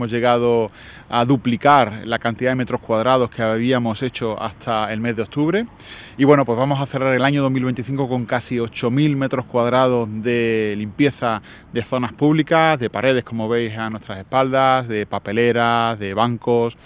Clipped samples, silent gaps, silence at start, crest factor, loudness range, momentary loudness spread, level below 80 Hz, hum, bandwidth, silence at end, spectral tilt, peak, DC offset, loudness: under 0.1%; none; 0 s; 18 dB; 2 LU; 8 LU; -50 dBFS; none; 4 kHz; 0.15 s; -10.5 dB/octave; 0 dBFS; under 0.1%; -19 LUFS